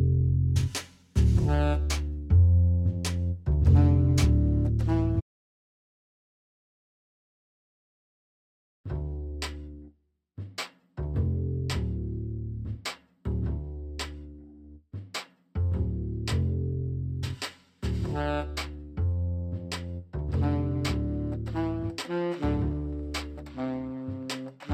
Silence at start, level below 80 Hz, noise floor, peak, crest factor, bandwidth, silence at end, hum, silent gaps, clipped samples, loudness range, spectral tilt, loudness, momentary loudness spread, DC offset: 0 s; -34 dBFS; -62 dBFS; -10 dBFS; 18 dB; 13 kHz; 0 s; none; 5.22-8.84 s; under 0.1%; 15 LU; -6.5 dB/octave; -29 LUFS; 15 LU; under 0.1%